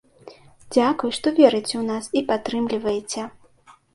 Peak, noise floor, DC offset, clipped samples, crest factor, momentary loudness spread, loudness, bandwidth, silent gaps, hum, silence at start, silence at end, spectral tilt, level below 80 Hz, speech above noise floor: 0 dBFS; -53 dBFS; under 0.1%; under 0.1%; 22 dB; 11 LU; -22 LUFS; 11.5 kHz; none; none; 0.25 s; 0.65 s; -4 dB/octave; -60 dBFS; 32 dB